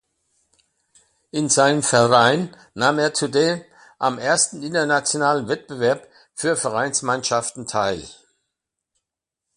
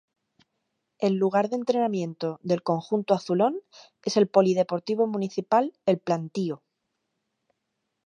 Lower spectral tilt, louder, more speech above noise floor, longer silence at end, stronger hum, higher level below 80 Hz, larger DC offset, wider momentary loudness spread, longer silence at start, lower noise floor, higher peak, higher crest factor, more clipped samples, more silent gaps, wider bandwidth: second, -3 dB/octave vs -6.5 dB/octave; first, -20 LUFS vs -25 LUFS; first, 65 dB vs 55 dB; about the same, 1.45 s vs 1.5 s; neither; first, -60 dBFS vs -76 dBFS; neither; about the same, 10 LU vs 10 LU; first, 1.35 s vs 1 s; first, -85 dBFS vs -80 dBFS; first, 0 dBFS vs -6 dBFS; about the same, 22 dB vs 22 dB; neither; neither; first, 11.5 kHz vs 9.8 kHz